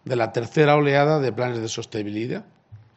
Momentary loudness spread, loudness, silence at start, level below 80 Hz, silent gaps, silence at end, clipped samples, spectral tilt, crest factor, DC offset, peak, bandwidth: 12 LU; -22 LUFS; 0.05 s; -64 dBFS; none; 0.2 s; under 0.1%; -6 dB/octave; 20 dB; under 0.1%; -2 dBFS; 8.2 kHz